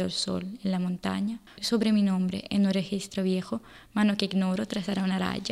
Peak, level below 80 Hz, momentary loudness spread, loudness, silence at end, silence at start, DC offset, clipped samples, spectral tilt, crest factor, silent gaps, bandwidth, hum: -10 dBFS; -60 dBFS; 7 LU; -28 LUFS; 0 s; 0 s; under 0.1%; under 0.1%; -5.5 dB/octave; 18 dB; none; 13.5 kHz; none